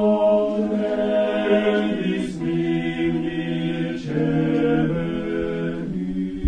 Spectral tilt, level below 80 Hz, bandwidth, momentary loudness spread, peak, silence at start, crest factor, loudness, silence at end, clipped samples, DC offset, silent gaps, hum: -8 dB/octave; -46 dBFS; 10 kHz; 7 LU; -8 dBFS; 0 s; 14 dB; -22 LUFS; 0 s; under 0.1%; 0.1%; none; none